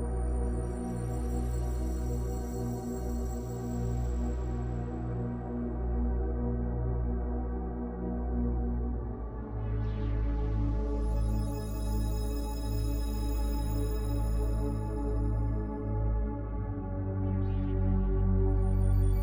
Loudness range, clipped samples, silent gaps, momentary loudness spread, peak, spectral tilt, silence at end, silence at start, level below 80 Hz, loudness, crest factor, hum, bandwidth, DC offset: 2 LU; under 0.1%; none; 6 LU; -16 dBFS; -8 dB/octave; 0 s; 0 s; -32 dBFS; -33 LUFS; 14 dB; none; 16 kHz; under 0.1%